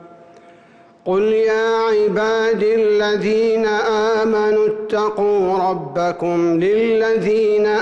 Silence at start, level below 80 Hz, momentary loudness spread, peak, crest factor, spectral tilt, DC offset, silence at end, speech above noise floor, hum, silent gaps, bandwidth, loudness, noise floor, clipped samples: 0.05 s; -54 dBFS; 4 LU; -10 dBFS; 8 dB; -6 dB/octave; under 0.1%; 0 s; 31 dB; none; none; 7.6 kHz; -17 LUFS; -47 dBFS; under 0.1%